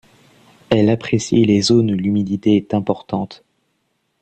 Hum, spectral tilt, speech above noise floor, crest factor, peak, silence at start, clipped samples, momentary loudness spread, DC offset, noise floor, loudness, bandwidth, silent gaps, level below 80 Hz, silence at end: none; -6 dB/octave; 52 dB; 16 dB; -2 dBFS; 0.7 s; under 0.1%; 9 LU; under 0.1%; -68 dBFS; -17 LUFS; 9 kHz; none; -50 dBFS; 0.85 s